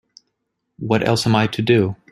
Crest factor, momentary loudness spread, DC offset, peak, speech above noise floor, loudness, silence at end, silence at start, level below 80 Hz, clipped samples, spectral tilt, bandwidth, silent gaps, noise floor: 18 dB; 4 LU; under 0.1%; -2 dBFS; 57 dB; -18 LUFS; 0.2 s; 0.8 s; -52 dBFS; under 0.1%; -6 dB/octave; 13.5 kHz; none; -75 dBFS